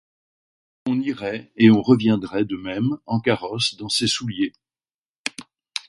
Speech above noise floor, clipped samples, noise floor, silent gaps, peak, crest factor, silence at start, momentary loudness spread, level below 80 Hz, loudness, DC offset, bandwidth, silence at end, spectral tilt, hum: over 70 dB; under 0.1%; under -90 dBFS; 4.94-5.24 s; -2 dBFS; 20 dB; 0.85 s; 15 LU; -58 dBFS; -21 LUFS; under 0.1%; 11.5 kHz; 0.1 s; -5 dB/octave; none